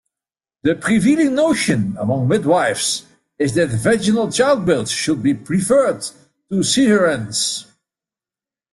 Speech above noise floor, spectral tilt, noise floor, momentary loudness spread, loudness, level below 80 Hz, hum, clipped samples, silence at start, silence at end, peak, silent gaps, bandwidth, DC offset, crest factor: over 74 dB; -4.5 dB/octave; under -90 dBFS; 7 LU; -17 LUFS; -52 dBFS; none; under 0.1%; 0.65 s; 1.1 s; -4 dBFS; none; 12.5 kHz; under 0.1%; 14 dB